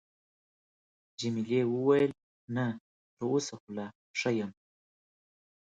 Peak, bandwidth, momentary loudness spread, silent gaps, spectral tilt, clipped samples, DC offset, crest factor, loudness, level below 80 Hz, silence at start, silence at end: -14 dBFS; 9.2 kHz; 14 LU; 2.23-2.48 s, 2.80-3.17 s, 3.60-3.67 s, 3.95-4.14 s; -5.5 dB/octave; under 0.1%; under 0.1%; 20 dB; -32 LUFS; -74 dBFS; 1.2 s; 1.1 s